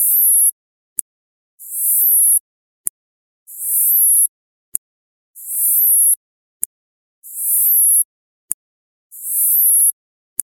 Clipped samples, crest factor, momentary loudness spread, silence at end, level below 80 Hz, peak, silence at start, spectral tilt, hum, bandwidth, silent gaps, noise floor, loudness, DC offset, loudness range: under 0.1%; 18 dB; 17 LU; 0.5 s; -76 dBFS; 0 dBFS; 0 s; 2.5 dB/octave; none; 17.5 kHz; 0.52-1.58 s, 2.40-3.46 s, 4.29-5.34 s, 6.17-6.60 s, 6.66-7.22 s, 8.05-8.48 s, 8.54-9.10 s; under -90 dBFS; -12 LUFS; under 0.1%; 3 LU